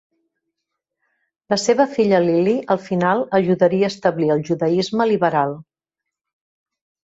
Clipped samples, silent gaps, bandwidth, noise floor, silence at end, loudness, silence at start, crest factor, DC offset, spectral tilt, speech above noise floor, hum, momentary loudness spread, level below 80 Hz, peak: under 0.1%; none; 8 kHz; -84 dBFS; 1.5 s; -18 LUFS; 1.5 s; 16 dB; under 0.1%; -6 dB/octave; 67 dB; none; 5 LU; -62 dBFS; -2 dBFS